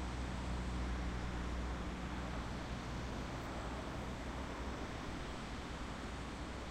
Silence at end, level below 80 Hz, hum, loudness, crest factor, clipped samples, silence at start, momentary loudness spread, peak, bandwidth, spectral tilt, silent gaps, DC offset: 0 s; -46 dBFS; none; -44 LUFS; 12 dB; under 0.1%; 0 s; 4 LU; -30 dBFS; 12 kHz; -5.5 dB/octave; none; under 0.1%